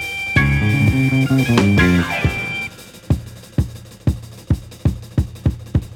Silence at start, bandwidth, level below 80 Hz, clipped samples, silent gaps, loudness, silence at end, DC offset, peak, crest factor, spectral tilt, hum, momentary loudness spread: 0 s; 17 kHz; -30 dBFS; under 0.1%; none; -18 LUFS; 0 s; under 0.1%; 0 dBFS; 18 dB; -6.5 dB/octave; none; 10 LU